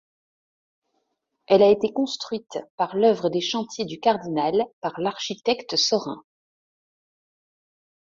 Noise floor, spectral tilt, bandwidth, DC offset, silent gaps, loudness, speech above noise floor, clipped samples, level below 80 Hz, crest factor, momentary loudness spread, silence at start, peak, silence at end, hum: -75 dBFS; -4 dB/octave; 7.6 kHz; under 0.1%; 2.70-2.78 s, 4.73-4.82 s; -23 LUFS; 52 dB; under 0.1%; -68 dBFS; 20 dB; 12 LU; 1.5 s; -4 dBFS; 1.9 s; none